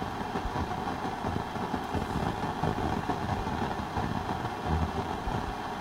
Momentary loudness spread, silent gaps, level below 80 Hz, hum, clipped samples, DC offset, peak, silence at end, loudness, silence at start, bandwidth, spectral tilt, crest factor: 3 LU; none; -42 dBFS; none; under 0.1%; under 0.1%; -14 dBFS; 0 s; -33 LUFS; 0 s; 16 kHz; -6.5 dB/octave; 18 dB